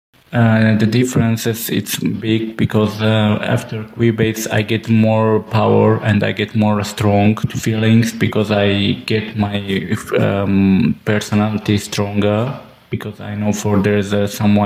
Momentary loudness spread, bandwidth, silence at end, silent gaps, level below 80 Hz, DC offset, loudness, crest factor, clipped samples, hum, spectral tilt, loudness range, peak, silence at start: 7 LU; 16 kHz; 0 s; none; -48 dBFS; under 0.1%; -16 LUFS; 14 dB; under 0.1%; none; -6 dB/octave; 2 LU; -2 dBFS; 0.3 s